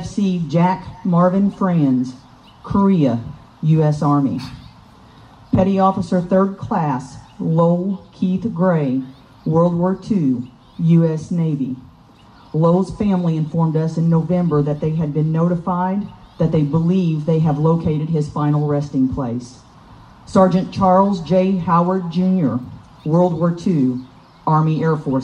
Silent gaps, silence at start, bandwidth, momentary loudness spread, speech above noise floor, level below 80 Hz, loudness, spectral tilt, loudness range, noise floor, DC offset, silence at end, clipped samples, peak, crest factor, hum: none; 0 s; 8.6 kHz; 10 LU; 29 dB; -46 dBFS; -18 LUFS; -9 dB/octave; 2 LU; -46 dBFS; under 0.1%; 0 s; under 0.1%; -2 dBFS; 14 dB; none